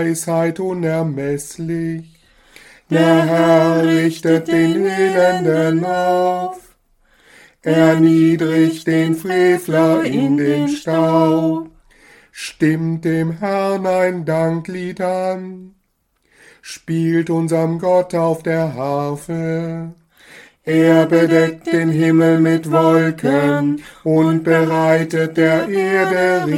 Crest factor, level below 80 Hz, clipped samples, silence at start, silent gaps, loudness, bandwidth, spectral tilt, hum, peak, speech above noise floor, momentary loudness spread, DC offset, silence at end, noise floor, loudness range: 16 dB; -56 dBFS; under 0.1%; 0 s; none; -16 LUFS; 14.5 kHz; -6.5 dB/octave; none; 0 dBFS; 49 dB; 10 LU; under 0.1%; 0 s; -64 dBFS; 6 LU